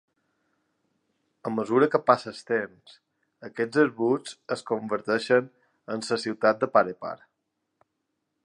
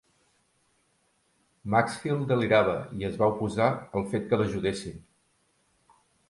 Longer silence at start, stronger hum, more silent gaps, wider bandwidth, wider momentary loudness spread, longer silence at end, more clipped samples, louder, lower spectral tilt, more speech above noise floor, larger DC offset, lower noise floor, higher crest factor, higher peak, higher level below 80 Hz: second, 1.45 s vs 1.65 s; neither; neither; about the same, 11 kHz vs 11.5 kHz; first, 16 LU vs 10 LU; about the same, 1.3 s vs 1.3 s; neither; about the same, -26 LUFS vs -27 LUFS; about the same, -5.5 dB/octave vs -6.5 dB/octave; first, 54 dB vs 44 dB; neither; first, -80 dBFS vs -70 dBFS; about the same, 24 dB vs 22 dB; about the same, -4 dBFS vs -6 dBFS; second, -76 dBFS vs -56 dBFS